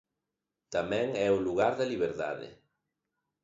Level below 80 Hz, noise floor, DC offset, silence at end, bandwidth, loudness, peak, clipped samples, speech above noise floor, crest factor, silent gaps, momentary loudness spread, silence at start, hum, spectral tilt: -64 dBFS; -87 dBFS; under 0.1%; 0.9 s; 7.8 kHz; -31 LUFS; -12 dBFS; under 0.1%; 57 dB; 20 dB; none; 9 LU; 0.7 s; none; -5.5 dB/octave